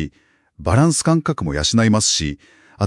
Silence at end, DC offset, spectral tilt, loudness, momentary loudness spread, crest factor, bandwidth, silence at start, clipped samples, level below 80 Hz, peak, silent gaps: 0 s; under 0.1%; -4.5 dB/octave; -17 LUFS; 13 LU; 16 dB; 12 kHz; 0 s; under 0.1%; -38 dBFS; -2 dBFS; none